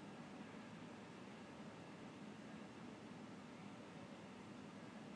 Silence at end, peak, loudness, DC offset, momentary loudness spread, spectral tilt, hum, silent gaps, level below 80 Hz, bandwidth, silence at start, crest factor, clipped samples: 0 s; -42 dBFS; -56 LUFS; under 0.1%; 1 LU; -5.5 dB/octave; none; none; -84 dBFS; 10.5 kHz; 0 s; 12 dB; under 0.1%